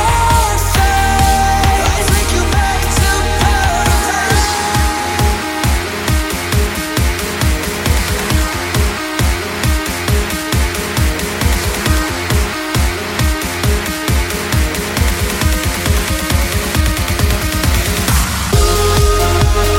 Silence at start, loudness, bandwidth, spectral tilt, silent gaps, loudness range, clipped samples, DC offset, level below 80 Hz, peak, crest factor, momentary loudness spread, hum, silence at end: 0 s; -14 LUFS; 17 kHz; -4 dB/octave; none; 3 LU; under 0.1%; under 0.1%; -18 dBFS; 0 dBFS; 14 dB; 4 LU; none; 0 s